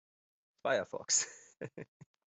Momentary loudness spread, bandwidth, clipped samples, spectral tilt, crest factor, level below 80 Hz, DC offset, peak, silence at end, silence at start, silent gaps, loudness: 19 LU; 8.2 kHz; under 0.1%; -1 dB/octave; 22 dB; -84 dBFS; under 0.1%; -16 dBFS; 0.55 s; 0.65 s; none; -34 LUFS